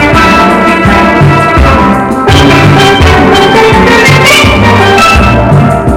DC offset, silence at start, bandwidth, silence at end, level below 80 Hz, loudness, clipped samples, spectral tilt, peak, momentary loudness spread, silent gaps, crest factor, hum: under 0.1%; 0 s; 17 kHz; 0 s; -16 dBFS; -3 LUFS; 10%; -5.5 dB/octave; 0 dBFS; 3 LU; none; 4 dB; none